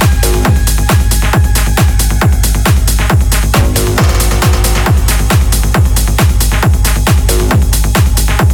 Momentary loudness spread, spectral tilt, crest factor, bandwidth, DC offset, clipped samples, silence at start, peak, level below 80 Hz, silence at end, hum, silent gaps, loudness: 1 LU; -4.5 dB/octave; 8 dB; 18.5 kHz; under 0.1%; under 0.1%; 0 s; 0 dBFS; -10 dBFS; 0 s; none; none; -10 LUFS